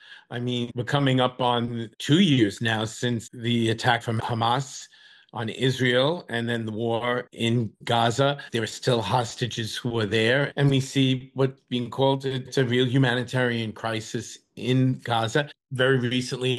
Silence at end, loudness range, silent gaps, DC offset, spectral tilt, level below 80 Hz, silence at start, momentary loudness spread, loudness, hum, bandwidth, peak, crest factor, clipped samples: 0 s; 2 LU; none; under 0.1%; -5.5 dB/octave; -64 dBFS; 0.1 s; 9 LU; -25 LUFS; none; 12.5 kHz; -8 dBFS; 16 dB; under 0.1%